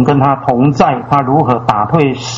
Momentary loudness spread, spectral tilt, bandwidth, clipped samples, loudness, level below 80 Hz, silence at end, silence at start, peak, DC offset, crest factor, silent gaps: 2 LU; -7 dB/octave; 7.6 kHz; 0.2%; -12 LUFS; -42 dBFS; 0 s; 0 s; 0 dBFS; under 0.1%; 12 dB; none